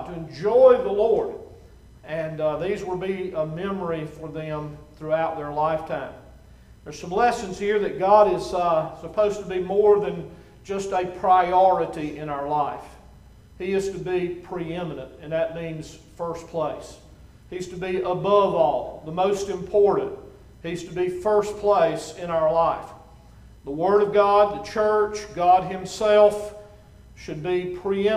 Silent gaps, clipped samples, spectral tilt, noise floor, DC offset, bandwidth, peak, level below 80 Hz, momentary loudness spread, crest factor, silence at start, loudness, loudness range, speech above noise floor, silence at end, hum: none; under 0.1%; -6 dB/octave; -48 dBFS; under 0.1%; 12.5 kHz; -4 dBFS; -50 dBFS; 16 LU; 20 dB; 0 s; -23 LUFS; 8 LU; 26 dB; 0 s; none